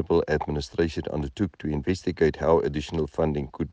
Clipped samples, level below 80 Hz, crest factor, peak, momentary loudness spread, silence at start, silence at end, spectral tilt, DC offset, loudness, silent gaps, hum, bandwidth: under 0.1%; -40 dBFS; 18 dB; -8 dBFS; 7 LU; 0 s; 0 s; -7 dB/octave; under 0.1%; -26 LUFS; none; none; 9.2 kHz